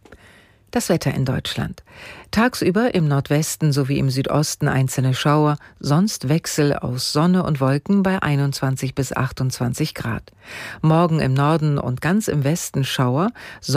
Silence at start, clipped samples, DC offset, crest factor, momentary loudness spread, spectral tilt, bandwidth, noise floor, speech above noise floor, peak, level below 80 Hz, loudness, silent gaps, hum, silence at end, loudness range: 0.1 s; under 0.1%; under 0.1%; 14 dB; 9 LU; -5.5 dB/octave; 16 kHz; -50 dBFS; 31 dB; -6 dBFS; -48 dBFS; -20 LUFS; none; none; 0 s; 2 LU